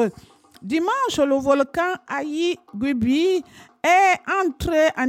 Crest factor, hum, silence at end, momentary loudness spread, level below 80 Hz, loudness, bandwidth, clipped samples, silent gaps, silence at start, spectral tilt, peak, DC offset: 16 dB; none; 0 s; 9 LU; -48 dBFS; -21 LUFS; 16.5 kHz; under 0.1%; none; 0 s; -4.5 dB/octave; -6 dBFS; under 0.1%